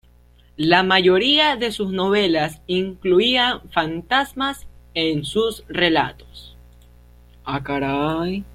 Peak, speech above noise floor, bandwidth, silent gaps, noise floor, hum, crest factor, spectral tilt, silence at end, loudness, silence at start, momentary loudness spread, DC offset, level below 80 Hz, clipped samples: -2 dBFS; 32 dB; 14 kHz; none; -51 dBFS; 60 Hz at -45 dBFS; 18 dB; -5 dB/octave; 0 s; -19 LUFS; 0.6 s; 11 LU; under 0.1%; -46 dBFS; under 0.1%